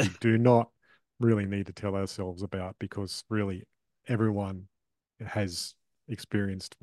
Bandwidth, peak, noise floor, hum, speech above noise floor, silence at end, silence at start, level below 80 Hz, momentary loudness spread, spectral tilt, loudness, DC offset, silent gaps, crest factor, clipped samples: 12.5 kHz; -8 dBFS; -63 dBFS; none; 33 dB; 0.15 s; 0 s; -68 dBFS; 16 LU; -6.5 dB/octave; -30 LUFS; under 0.1%; none; 22 dB; under 0.1%